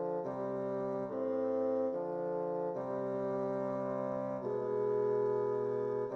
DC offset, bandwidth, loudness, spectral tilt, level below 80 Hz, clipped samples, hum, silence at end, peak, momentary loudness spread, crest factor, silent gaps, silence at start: under 0.1%; 6.2 kHz; -36 LUFS; -9.5 dB/octave; -76 dBFS; under 0.1%; none; 0 s; -24 dBFS; 5 LU; 10 dB; none; 0 s